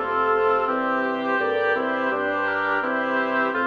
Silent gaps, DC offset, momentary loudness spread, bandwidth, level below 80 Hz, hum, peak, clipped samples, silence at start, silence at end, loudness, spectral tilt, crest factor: none; under 0.1%; 3 LU; 7 kHz; -66 dBFS; none; -10 dBFS; under 0.1%; 0 s; 0 s; -22 LUFS; -6 dB/octave; 14 dB